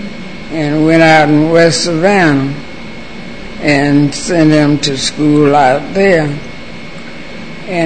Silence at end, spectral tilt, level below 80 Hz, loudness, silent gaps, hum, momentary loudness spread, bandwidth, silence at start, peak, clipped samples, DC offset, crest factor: 0 s; -5.5 dB/octave; -40 dBFS; -10 LUFS; none; none; 20 LU; 9.2 kHz; 0 s; 0 dBFS; 0.3%; 4%; 12 dB